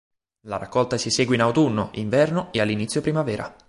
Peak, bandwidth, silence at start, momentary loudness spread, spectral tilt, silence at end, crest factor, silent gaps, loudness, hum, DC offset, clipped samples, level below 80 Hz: -6 dBFS; 11.5 kHz; 0.45 s; 7 LU; -5 dB/octave; 0.15 s; 16 dB; none; -22 LUFS; none; under 0.1%; under 0.1%; -54 dBFS